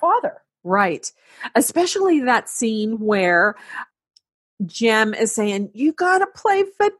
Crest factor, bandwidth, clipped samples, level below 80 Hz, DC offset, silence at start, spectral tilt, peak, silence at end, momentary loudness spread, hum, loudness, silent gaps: 18 dB; 13 kHz; under 0.1%; -70 dBFS; under 0.1%; 0 s; -3.5 dB/octave; -2 dBFS; 0.1 s; 16 LU; none; -19 LUFS; 4.34-4.57 s